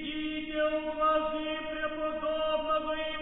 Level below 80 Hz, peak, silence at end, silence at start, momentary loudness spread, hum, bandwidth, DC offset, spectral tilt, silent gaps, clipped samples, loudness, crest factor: -52 dBFS; -18 dBFS; 0 s; 0 s; 7 LU; none; 4 kHz; under 0.1%; -7.5 dB/octave; none; under 0.1%; -31 LUFS; 14 dB